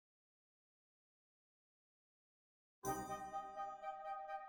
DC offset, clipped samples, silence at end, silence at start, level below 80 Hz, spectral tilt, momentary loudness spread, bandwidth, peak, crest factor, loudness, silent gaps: under 0.1%; under 0.1%; 0 s; 2.85 s; -76 dBFS; -4 dB/octave; 4 LU; over 20 kHz; -30 dBFS; 22 dB; -48 LUFS; none